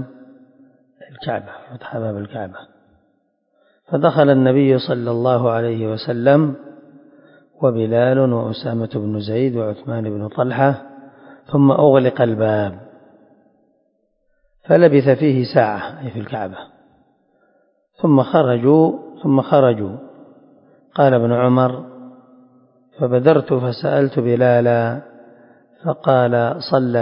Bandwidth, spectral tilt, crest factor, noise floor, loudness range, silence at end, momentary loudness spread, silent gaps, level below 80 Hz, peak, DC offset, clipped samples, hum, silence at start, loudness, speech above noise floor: 5.4 kHz; -11.5 dB/octave; 18 dB; -65 dBFS; 4 LU; 0 s; 15 LU; none; -58 dBFS; 0 dBFS; under 0.1%; under 0.1%; none; 0 s; -17 LUFS; 49 dB